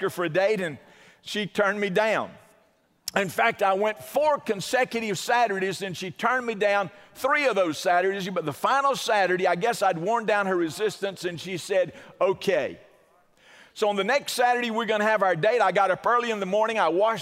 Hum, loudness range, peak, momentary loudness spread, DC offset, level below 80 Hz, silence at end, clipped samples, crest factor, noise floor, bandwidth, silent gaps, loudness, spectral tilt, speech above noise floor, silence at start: none; 4 LU; -6 dBFS; 9 LU; under 0.1%; -72 dBFS; 0 s; under 0.1%; 20 dB; -64 dBFS; 16 kHz; none; -25 LUFS; -4 dB/octave; 39 dB; 0 s